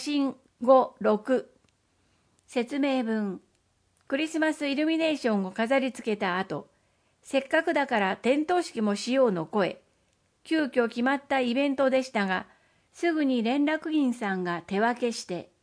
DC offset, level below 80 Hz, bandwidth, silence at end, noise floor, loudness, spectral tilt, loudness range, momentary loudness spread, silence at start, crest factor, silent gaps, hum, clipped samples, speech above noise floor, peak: under 0.1%; -74 dBFS; 10.5 kHz; 0.2 s; -70 dBFS; -27 LUFS; -5 dB/octave; 3 LU; 6 LU; 0 s; 20 dB; none; none; under 0.1%; 43 dB; -8 dBFS